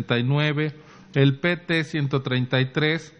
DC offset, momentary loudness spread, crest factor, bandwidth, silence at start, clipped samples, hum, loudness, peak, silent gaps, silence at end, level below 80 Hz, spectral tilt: under 0.1%; 5 LU; 18 dB; 8.2 kHz; 0 s; under 0.1%; none; -23 LUFS; -4 dBFS; none; 0.1 s; -62 dBFS; -7 dB/octave